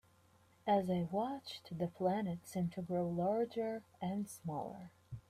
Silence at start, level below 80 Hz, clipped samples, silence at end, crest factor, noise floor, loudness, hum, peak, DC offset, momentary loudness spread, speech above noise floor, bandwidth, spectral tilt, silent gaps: 0.65 s; -72 dBFS; under 0.1%; 0.1 s; 18 dB; -69 dBFS; -39 LUFS; none; -22 dBFS; under 0.1%; 10 LU; 31 dB; 15 kHz; -7 dB/octave; none